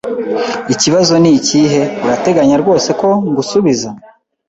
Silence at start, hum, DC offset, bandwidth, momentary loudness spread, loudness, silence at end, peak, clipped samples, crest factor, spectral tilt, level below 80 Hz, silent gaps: 0.05 s; none; under 0.1%; 8 kHz; 8 LU; -12 LUFS; 0.5 s; 0 dBFS; under 0.1%; 12 dB; -4.5 dB/octave; -50 dBFS; none